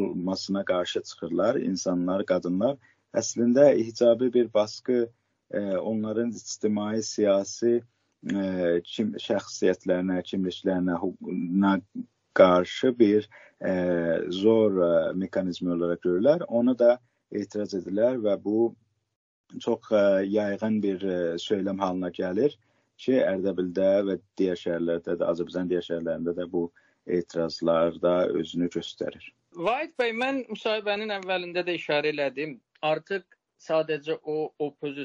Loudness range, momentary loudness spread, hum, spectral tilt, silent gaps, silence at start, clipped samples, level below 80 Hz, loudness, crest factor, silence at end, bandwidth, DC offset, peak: 5 LU; 10 LU; none; -5 dB/octave; 19.16-19.44 s; 0 s; under 0.1%; -68 dBFS; -26 LUFS; 22 dB; 0 s; 7.6 kHz; under 0.1%; -4 dBFS